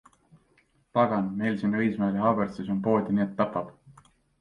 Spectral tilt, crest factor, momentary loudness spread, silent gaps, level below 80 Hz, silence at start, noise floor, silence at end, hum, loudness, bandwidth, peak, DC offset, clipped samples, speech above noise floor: -9 dB/octave; 18 dB; 5 LU; none; -62 dBFS; 0.95 s; -66 dBFS; 0.5 s; none; -27 LUFS; 5.6 kHz; -8 dBFS; under 0.1%; under 0.1%; 40 dB